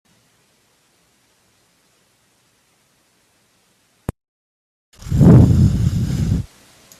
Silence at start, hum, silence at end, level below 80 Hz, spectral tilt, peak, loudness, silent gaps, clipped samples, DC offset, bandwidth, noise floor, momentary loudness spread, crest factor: 5.05 s; none; 0.55 s; -32 dBFS; -9 dB/octave; 0 dBFS; -14 LUFS; none; under 0.1%; under 0.1%; 13.5 kHz; -60 dBFS; 23 LU; 18 dB